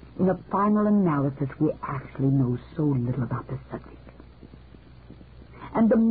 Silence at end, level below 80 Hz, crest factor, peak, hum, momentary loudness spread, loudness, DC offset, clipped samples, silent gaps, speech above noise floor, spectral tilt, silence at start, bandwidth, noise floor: 0 s; -50 dBFS; 14 dB; -12 dBFS; none; 14 LU; -25 LUFS; 0.1%; under 0.1%; none; 24 dB; -13.5 dB/octave; 0.05 s; 4.6 kHz; -48 dBFS